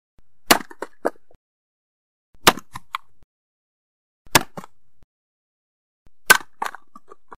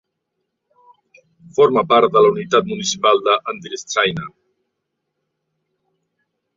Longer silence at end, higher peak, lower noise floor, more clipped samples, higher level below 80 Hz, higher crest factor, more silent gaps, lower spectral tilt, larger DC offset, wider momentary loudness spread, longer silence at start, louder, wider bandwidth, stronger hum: second, 0.7 s vs 2.3 s; about the same, 0 dBFS vs 0 dBFS; second, -50 dBFS vs -76 dBFS; neither; first, -50 dBFS vs -62 dBFS; first, 26 dB vs 18 dB; first, 1.36-2.33 s, 3.24-4.25 s, 5.04-6.05 s vs none; second, -1.5 dB/octave vs -3.5 dB/octave; first, 1% vs under 0.1%; first, 19 LU vs 14 LU; second, 0.5 s vs 1.6 s; second, -19 LUFS vs -16 LUFS; first, 15.5 kHz vs 7.6 kHz; neither